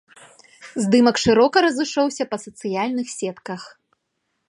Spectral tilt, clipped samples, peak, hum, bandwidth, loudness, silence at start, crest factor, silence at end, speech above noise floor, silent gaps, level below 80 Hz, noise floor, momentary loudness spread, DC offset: -4.5 dB/octave; under 0.1%; -2 dBFS; none; 11.5 kHz; -20 LUFS; 0.6 s; 20 dB; 0.8 s; 55 dB; none; -56 dBFS; -74 dBFS; 17 LU; under 0.1%